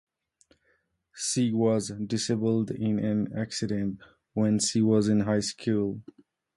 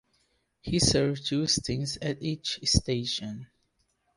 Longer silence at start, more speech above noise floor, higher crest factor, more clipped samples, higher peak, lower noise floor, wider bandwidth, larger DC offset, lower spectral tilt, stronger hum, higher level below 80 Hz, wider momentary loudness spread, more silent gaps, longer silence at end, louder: first, 1.15 s vs 0.65 s; about the same, 45 dB vs 45 dB; second, 16 dB vs 22 dB; neither; second, -12 dBFS vs -8 dBFS; about the same, -71 dBFS vs -73 dBFS; about the same, 11.5 kHz vs 11.5 kHz; neither; first, -5.5 dB/octave vs -4 dB/octave; neither; second, -60 dBFS vs -46 dBFS; about the same, 10 LU vs 10 LU; neither; second, 0.55 s vs 0.7 s; about the same, -27 LUFS vs -27 LUFS